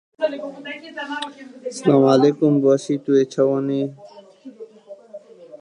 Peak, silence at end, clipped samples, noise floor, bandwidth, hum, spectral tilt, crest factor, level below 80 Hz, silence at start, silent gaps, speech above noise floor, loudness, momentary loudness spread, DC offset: -2 dBFS; 0.05 s; under 0.1%; -43 dBFS; 10.5 kHz; none; -6.5 dB/octave; 18 dB; -74 dBFS; 0.2 s; none; 24 dB; -19 LUFS; 23 LU; under 0.1%